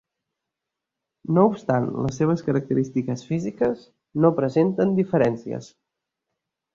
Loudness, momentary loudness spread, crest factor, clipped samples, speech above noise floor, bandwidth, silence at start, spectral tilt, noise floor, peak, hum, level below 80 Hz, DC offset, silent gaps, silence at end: -23 LUFS; 13 LU; 20 dB; under 0.1%; 63 dB; 7.6 kHz; 1.3 s; -8.5 dB/octave; -85 dBFS; -4 dBFS; none; -58 dBFS; under 0.1%; none; 1.1 s